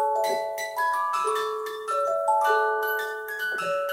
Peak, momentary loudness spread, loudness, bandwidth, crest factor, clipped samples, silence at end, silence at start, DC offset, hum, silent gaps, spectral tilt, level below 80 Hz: -12 dBFS; 8 LU; -26 LUFS; 17 kHz; 14 dB; under 0.1%; 0 s; 0 s; under 0.1%; none; none; -1 dB/octave; -76 dBFS